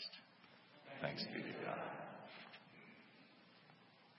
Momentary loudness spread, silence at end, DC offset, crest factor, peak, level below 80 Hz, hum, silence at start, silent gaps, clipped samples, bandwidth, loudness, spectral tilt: 20 LU; 0 s; under 0.1%; 26 dB; -26 dBFS; -90 dBFS; none; 0 s; none; under 0.1%; 5.6 kHz; -48 LUFS; -3 dB/octave